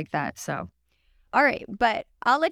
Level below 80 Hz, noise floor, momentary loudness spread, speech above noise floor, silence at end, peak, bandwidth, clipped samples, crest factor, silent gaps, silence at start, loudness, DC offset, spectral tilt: -58 dBFS; -64 dBFS; 11 LU; 39 dB; 0 s; -6 dBFS; 16 kHz; under 0.1%; 20 dB; none; 0 s; -25 LUFS; under 0.1%; -4.5 dB/octave